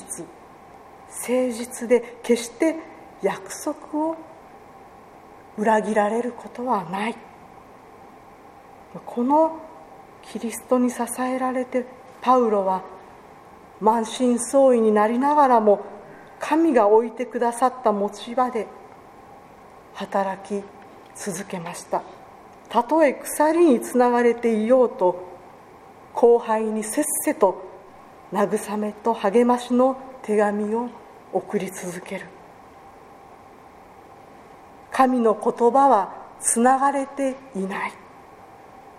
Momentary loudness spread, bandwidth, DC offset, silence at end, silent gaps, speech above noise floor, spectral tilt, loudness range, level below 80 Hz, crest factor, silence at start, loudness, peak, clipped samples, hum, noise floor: 17 LU; 15.5 kHz; under 0.1%; 0.2 s; none; 26 dB; -4.5 dB/octave; 10 LU; -64 dBFS; 20 dB; 0 s; -22 LUFS; -2 dBFS; under 0.1%; none; -46 dBFS